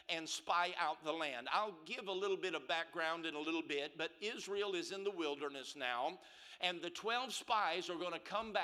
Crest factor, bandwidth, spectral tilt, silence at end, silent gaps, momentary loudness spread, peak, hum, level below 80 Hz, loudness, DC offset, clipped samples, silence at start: 20 dB; 14.5 kHz; -2 dB/octave; 0 s; none; 7 LU; -20 dBFS; none; -82 dBFS; -40 LUFS; under 0.1%; under 0.1%; 0.1 s